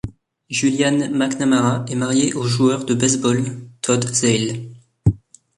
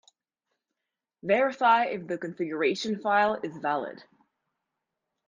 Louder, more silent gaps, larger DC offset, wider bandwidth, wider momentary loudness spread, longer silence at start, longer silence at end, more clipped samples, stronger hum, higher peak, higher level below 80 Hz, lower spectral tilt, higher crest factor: first, -19 LUFS vs -27 LUFS; neither; neither; first, 11.5 kHz vs 9.6 kHz; about the same, 9 LU vs 11 LU; second, 0.05 s vs 1.25 s; second, 0.4 s vs 1.25 s; neither; neither; first, -4 dBFS vs -10 dBFS; first, -42 dBFS vs -74 dBFS; about the same, -4.5 dB/octave vs -5 dB/octave; about the same, 16 dB vs 20 dB